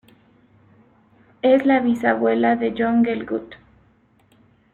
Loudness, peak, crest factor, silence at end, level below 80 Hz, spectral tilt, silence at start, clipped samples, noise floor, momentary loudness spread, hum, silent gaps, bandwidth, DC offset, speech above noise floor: -19 LUFS; -4 dBFS; 18 dB; 1.2 s; -60 dBFS; -7 dB/octave; 1.45 s; under 0.1%; -58 dBFS; 9 LU; none; none; 7.2 kHz; under 0.1%; 40 dB